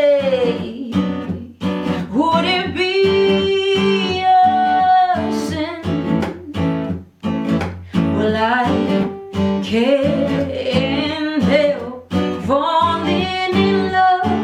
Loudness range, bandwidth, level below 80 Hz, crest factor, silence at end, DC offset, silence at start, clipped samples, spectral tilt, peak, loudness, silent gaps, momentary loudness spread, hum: 4 LU; 12 kHz; -52 dBFS; 14 dB; 0 s; under 0.1%; 0 s; under 0.1%; -6.5 dB/octave; -2 dBFS; -17 LUFS; none; 8 LU; none